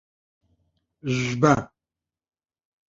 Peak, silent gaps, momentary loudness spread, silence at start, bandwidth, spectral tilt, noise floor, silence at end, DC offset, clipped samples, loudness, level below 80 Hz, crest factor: -2 dBFS; none; 17 LU; 1.05 s; 7.8 kHz; -6 dB/octave; -89 dBFS; 1.25 s; under 0.1%; under 0.1%; -23 LUFS; -56 dBFS; 24 dB